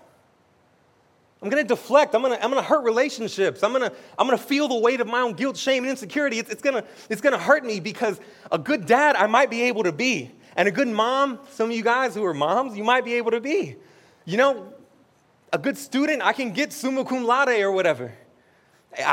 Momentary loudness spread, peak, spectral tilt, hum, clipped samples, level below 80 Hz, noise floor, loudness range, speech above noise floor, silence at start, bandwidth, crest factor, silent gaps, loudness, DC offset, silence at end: 9 LU; -2 dBFS; -4 dB/octave; none; under 0.1%; -78 dBFS; -61 dBFS; 4 LU; 38 dB; 1.4 s; 17 kHz; 20 dB; none; -22 LUFS; under 0.1%; 0 s